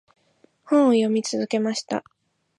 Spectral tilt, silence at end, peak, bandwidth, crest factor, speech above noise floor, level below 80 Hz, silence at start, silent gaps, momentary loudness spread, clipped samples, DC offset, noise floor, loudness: -4.5 dB/octave; 0.6 s; -8 dBFS; 11.5 kHz; 16 dB; 40 dB; -76 dBFS; 0.65 s; none; 11 LU; under 0.1%; under 0.1%; -62 dBFS; -22 LUFS